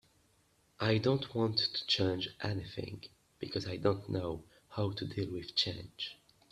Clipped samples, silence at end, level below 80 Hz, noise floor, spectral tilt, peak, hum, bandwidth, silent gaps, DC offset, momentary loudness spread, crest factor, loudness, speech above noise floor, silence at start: under 0.1%; 0.35 s; -64 dBFS; -71 dBFS; -6 dB/octave; -16 dBFS; none; 12.5 kHz; none; under 0.1%; 13 LU; 20 dB; -35 LUFS; 36 dB; 0.8 s